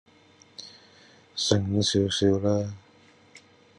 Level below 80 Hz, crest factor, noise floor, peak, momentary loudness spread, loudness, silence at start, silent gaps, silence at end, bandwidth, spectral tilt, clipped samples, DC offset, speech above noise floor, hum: -66 dBFS; 22 dB; -57 dBFS; -6 dBFS; 23 LU; -25 LUFS; 0.6 s; none; 0.4 s; 10.5 kHz; -5 dB/octave; under 0.1%; under 0.1%; 33 dB; none